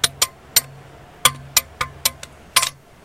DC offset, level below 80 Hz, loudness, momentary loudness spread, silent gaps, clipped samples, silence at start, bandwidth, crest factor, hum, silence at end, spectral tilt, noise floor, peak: under 0.1%; -48 dBFS; -19 LUFS; 7 LU; none; under 0.1%; 0.05 s; 17 kHz; 22 dB; none; 0.35 s; 0.5 dB/octave; -43 dBFS; 0 dBFS